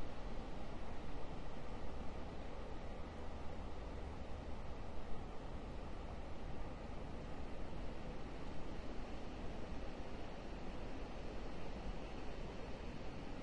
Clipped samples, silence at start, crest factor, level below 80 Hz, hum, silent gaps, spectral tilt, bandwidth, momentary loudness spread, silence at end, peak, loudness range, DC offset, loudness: under 0.1%; 0 s; 14 dB; -50 dBFS; none; none; -6.5 dB/octave; 9 kHz; 1 LU; 0 s; -30 dBFS; 1 LU; under 0.1%; -51 LUFS